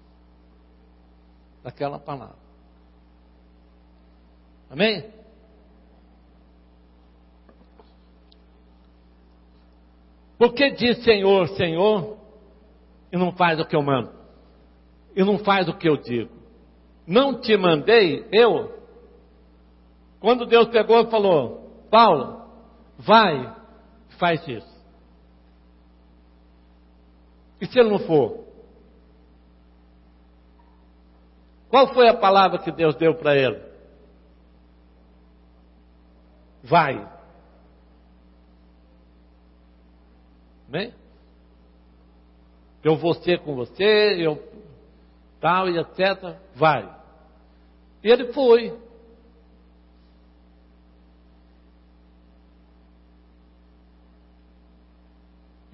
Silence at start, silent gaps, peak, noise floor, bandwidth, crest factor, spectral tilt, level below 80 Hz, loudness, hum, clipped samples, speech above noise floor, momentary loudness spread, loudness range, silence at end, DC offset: 1.65 s; none; -4 dBFS; -53 dBFS; 5.8 kHz; 20 dB; -10 dB/octave; -54 dBFS; -20 LUFS; none; under 0.1%; 34 dB; 19 LU; 17 LU; 6.95 s; under 0.1%